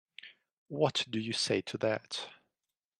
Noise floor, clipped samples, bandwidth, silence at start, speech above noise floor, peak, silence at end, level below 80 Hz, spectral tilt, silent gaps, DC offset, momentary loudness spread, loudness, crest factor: under -90 dBFS; under 0.1%; 12.5 kHz; 0.25 s; over 57 dB; -14 dBFS; 0.65 s; -76 dBFS; -4 dB/octave; 0.53-0.66 s; under 0.1%; 20 LU; -33 LUFS; 22 dB